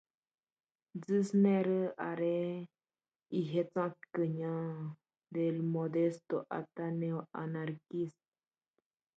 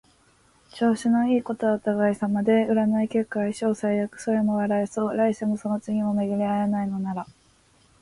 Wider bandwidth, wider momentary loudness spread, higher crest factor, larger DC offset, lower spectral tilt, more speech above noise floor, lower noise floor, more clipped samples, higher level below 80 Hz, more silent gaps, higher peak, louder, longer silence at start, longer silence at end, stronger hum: second, 8.2 kHz vs 11.5 kHz; first, 12 LU vs 6 LU; about the same, 18 dB vs 14 dB; neither; first, -8.5 dB/octave vs -7 dB/octave; first, over 55 dB vs 37 dB; first, under -90 dBFS vs -60 dBFS; neither; second, -84 dBFS vs -62 dBFS; neither; second, -18 dBFS vs -10 dBFS; second, -36 LUFS vs -24 LUFS; first, 0.95 s vs 0.75 s; first, 1.1 s vs 0.8 s; neither